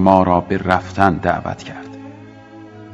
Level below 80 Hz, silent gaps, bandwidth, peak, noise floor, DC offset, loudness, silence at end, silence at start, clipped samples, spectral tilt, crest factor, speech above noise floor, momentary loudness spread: -44 dBFS; none; 8.8 kHz; 0 dBFS; -39 dBFS; under 0.1%; -17 LUFS; 0 s; 0 s; 0.2%; -7.5 dB/octave; 18 dB; 22 dB; 23 LU